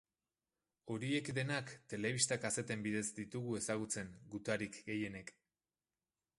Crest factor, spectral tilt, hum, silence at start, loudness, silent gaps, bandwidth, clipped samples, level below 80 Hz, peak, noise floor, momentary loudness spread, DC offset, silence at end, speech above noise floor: 22 dB; -4 dB/octave; none; 0.85 s; -40 LUFS; none; 11.5 kHz; under 0.1%; -74 dBFS; -20 dBFS; under -90 dBFS; 12 LU; under 0.1%; 1.1 s; over 49 dB